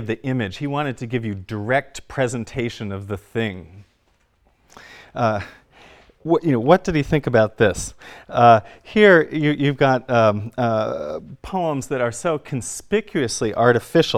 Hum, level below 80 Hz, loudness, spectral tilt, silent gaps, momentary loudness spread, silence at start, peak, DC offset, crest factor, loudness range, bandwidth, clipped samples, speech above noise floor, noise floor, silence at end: none; -48 dBFS; -20 LUFS; -5.5 dB/octave; none; 13 LU; 0 s; 0 dBFS; under 0.1%; 20 dB; 12 LU; 15 kHz; under 0.1%; 43 dB; -62 dBFS; 0 s